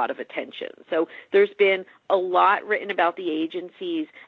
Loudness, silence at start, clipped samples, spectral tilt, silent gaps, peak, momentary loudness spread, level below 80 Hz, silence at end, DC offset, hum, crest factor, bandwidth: -23 LUFS; 0 s; under 0.1%; -6.5 dB/octave; none; -6 dBFS; 13 LU; -78 dBFS; 0.2 s; under 0.1%; none; 16 dB; 4.7 kHz